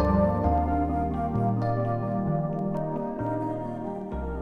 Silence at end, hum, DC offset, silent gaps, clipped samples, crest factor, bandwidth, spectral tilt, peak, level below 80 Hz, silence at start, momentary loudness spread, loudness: 0 s; none; under 0.1%; none; under 0.1%; 16 dB; 5.6 kHz; -10.5 dB/octave; -10 dBFS; -36 dBFS; 0 s; 9 LU; -28 LUFS